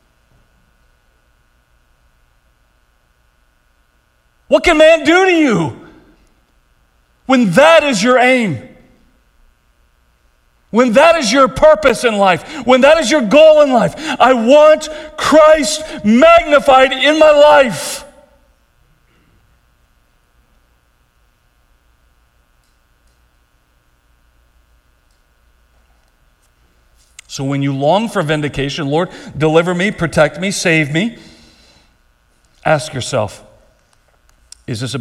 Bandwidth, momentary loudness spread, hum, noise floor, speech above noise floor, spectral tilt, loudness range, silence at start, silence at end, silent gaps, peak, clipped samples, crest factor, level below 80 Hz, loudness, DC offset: 14 kHz; 13 LU; none; -57 dBFS; 46 dB; -4.5 dB/octave; 11 LU; 4.5 s; 0 s; none; 0 dBFS; under 0.1%; 14 dB; -44 dBFS; -11 LUFS; under 0.1%